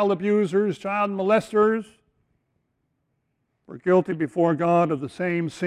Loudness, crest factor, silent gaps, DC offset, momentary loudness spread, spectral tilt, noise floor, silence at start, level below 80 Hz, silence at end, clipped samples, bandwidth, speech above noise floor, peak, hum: -23 LUFS; 16 dB; none; under 0.1%; 6 LU; -7.5 dB/octave; -74 dBFS; 0 s; -66 dBFS; 0 s; under 0.1%; 11 kHz; 52 dB; -8 dBFS; none